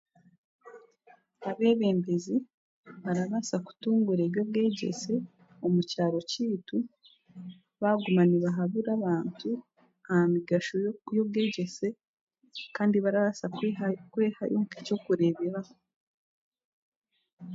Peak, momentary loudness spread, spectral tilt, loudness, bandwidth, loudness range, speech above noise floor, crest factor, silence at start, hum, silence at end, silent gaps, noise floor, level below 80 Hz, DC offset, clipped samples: -14 dBFS; 13 LU; -6.5 dB/octave; -29 LUFS; 7.8 kHz; 3 LU; 33 dB; 16 dB; 0.65 s; none; 0 s; 2.54-2.84 s, 12.08-12.27 s, 15.96-16.52 s, 16.64-17.02 s, 17.33-17.37 s; -62 dBFS; -76 dBFS; under 0.1%; under 0.1%